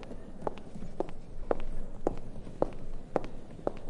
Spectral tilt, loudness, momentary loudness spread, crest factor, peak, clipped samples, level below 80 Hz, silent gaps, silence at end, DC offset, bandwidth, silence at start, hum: -7.5 dB/octave; -39 LUFS; 11 LU; 24 dB; -10 dBFS; under 0.1%; -40 dBFS; none; 0 s; under 0.1%; 5.4 kHz; 0 s; none